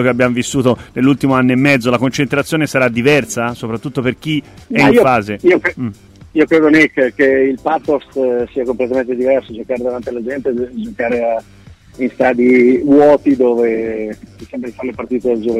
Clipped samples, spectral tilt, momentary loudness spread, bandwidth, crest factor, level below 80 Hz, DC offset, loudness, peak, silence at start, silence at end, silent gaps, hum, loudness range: under 0.1%; -6 dB/octave; 13 LU; 15 kHz; 14 dB; -46 dBFS; under 0.1%; -14 LUFS; 0 dBFS; 0 s; 0 s; none; none; 5 LU